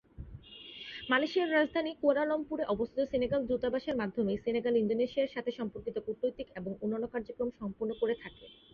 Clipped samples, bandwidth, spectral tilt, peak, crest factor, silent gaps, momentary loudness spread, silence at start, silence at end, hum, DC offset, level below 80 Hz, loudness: under 0.1%; 6.8 kHz; -7 dB/octave; -16 dBFS; 18 dB; none; 13 LU; 0.2 s; 0.2 s; none; under 0.1%; -60 dBFS; -33 LUFS